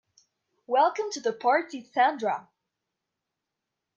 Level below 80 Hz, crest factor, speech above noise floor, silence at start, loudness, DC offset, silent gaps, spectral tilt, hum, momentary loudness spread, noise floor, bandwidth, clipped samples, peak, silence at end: -88 dBFS; 20 dB; 60 dB; 0.7 s; -26 LUFS; under 0.1%; none; -3 dB/octave; none; 7 LU; -85 dBFS; 7.6 kHz; under 0.1%; -10 dBFS; 1.55 s